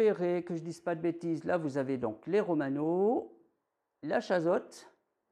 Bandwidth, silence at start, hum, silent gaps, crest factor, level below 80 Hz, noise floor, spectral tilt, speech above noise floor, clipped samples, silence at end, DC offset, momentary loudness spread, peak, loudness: 11 kHz; 0 s; none; none; 16 dB; -78 dBFS; -82 dBFS; -7 dB/octave; 51 dB; under 0.1%; 0.45 s; under 0.1%; 8 LU; -18 dBFS; -32 LUFS